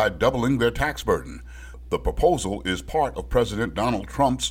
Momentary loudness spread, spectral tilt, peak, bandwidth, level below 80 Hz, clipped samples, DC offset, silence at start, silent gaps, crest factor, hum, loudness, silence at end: 8 LU; -5 dB/octave; -6 dBFS; 16.5 kHz; -36 dBFS; under 0.1%; under 0.1%; 0 s; none; 16 dB; none; -24 LUFS; 0 s